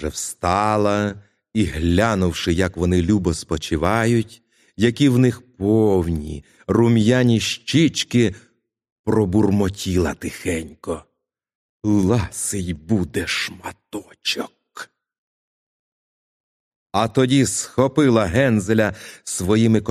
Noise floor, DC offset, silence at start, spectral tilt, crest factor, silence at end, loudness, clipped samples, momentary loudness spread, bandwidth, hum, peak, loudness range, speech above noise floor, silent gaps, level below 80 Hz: -40 dBFS; under 0.1%; 0 s; -5.5 dB/octave; 18 dB; 0 s; -19 LUFS; under 0.1%; 14 LU; 14.5 kHz; none; -2 dBFS; 8 LU; 21 dB; 8.92-9.04 s, 11.55-11.80 s, 15.18-16.86 s; -40 dBFS